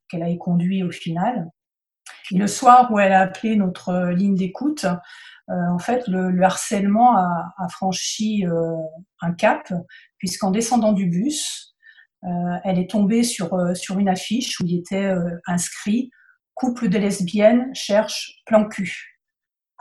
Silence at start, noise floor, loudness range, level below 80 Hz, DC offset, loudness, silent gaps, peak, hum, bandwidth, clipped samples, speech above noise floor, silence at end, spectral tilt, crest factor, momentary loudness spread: 0.1 s; -86 dBFS; 5 LU; -60 dBFS; under 0.1%; -20 LUFS; none; 0 dBFS; none; 12.5 kHz; under 0.1%; 66 dB; 0.75 s; -5.5 dB/octave; 20 dB; 13 LU